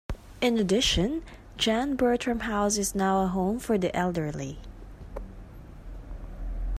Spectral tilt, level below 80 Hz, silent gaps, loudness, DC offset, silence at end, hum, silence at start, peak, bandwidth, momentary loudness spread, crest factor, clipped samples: -4 dB/octave; -40 dBFS; none; -27 LUFS; under 0.1%; 0 s; none; 0.1 s; -10 dBFS; 15.5 kHz; 22 LU; 18 dB; under 0.1%